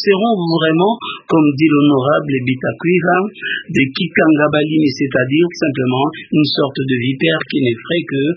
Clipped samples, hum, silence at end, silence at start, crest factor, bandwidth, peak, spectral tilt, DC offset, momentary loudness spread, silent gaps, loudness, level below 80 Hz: under 0.1%; none; 0 s; 0 s; 14 dB; 7.4 kHz; 0 dBFS; -7 dB/octave; under 0.1%; 6 LU; none; -15 LUFS; -56 dBFS